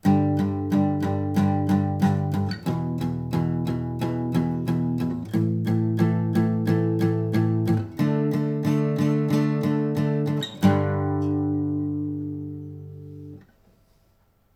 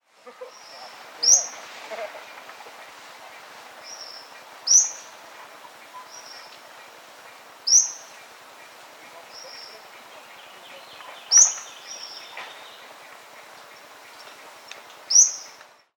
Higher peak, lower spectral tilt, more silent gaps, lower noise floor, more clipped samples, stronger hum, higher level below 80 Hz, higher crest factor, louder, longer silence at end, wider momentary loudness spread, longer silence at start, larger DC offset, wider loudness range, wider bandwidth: about the same, -6 dBFS vs -4 dBFS; first, -8.5 dB/octave vs 4 dB/octave; neither; first, -62 dBFS vs -49 dBFS; neither; neither; first, -54 dBFS vs -86 dBFS; second, 18 dB vs 24 dB; second, -24 LUFS vs -17 LUFS; first, 1.15 s vs 0.55 s; second, 7 LU vs 28 LU; second, 0.05 s vs 0.25 s; neither; second, 3 LU vs 16 LU; second, 16 kHz vs 19 kHz